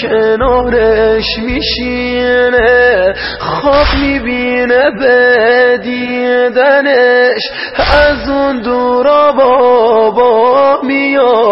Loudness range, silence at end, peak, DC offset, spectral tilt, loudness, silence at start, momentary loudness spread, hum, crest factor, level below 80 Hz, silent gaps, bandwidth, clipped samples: 2 LU; 0 s; 0 dBFS; under 0.1%; -7.5 dB/octave; -9 LUFS; 0 s; 7 LU; none; 10 dB; -28 dBFS; none; 5.8 kHz; under 0.1%